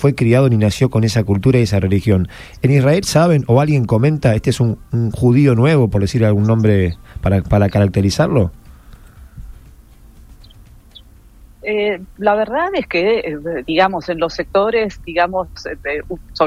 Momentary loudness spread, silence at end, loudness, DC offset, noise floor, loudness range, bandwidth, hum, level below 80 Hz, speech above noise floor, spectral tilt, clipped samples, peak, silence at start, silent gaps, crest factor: 10 LU; 0 s; -15 LUFS; under 0.1%; -43 dBFS; 8 LU; 14.5 kHz; none; -36 dBFS; 28 dB; -7 dB/octave; under 0.1%; 0 dBFS; 0 s; none; 14 dB